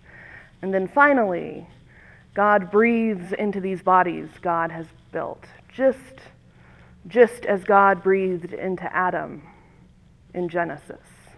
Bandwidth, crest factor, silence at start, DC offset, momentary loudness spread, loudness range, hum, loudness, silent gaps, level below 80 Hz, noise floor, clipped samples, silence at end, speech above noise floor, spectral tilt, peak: 11 kHz; 22 dB; 0.15 s; under 0.1%; 19 LU; 4 LU; none; -21 LUFS; none; -58 dBFS; -52 dBFS; under 0.1%; 0.45 s; 31 dB; -7.5 dB/octave; -2 dBFS